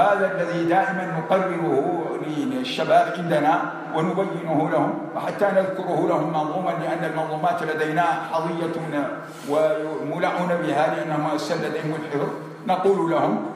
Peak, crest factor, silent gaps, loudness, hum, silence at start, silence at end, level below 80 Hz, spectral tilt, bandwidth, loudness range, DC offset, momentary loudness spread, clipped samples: -6 dBFS; 16 dB; none; -23 LUFS; none; 0 s; 0 s; -74 dBFS; -6.5 dB/octave; 14.5 kHz; 2 LU; under 0.1%; 7 LU; under 0.1%